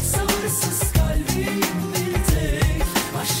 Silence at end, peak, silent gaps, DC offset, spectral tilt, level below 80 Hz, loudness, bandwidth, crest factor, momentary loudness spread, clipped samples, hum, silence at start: 0 s; -6 dBFS; none; under 0.1%; -4 dB/octave; -26 dBFS; -21 LUFS; 16.5 kHz; 14 dB; 3 LU; under 0.1%; none; 0 s